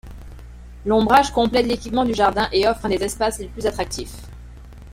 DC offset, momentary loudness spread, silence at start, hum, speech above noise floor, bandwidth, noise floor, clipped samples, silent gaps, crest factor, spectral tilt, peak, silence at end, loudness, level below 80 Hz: under 0.1%; 20 LU; 0.05 s; none; 20 dB; 16.5 kHz; -39 dBFS; under 0.1%; none; 20 dB; -4.5 dB/octave; -2 dBFS; 0 s; -20 LUFS; -38 dBFS